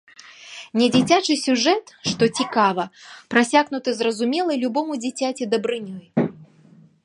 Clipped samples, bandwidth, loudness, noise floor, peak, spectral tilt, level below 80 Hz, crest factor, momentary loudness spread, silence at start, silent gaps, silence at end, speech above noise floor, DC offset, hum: under 0.1%; 11.5 kHz; -21 LUFS; -51 dBFS; 0 dBFS; -4 dB/octave; -64 dBFS; 22 dB; 10 LU; 0.25 s; none; 0.6 s; 31 dB; under 0.1%; none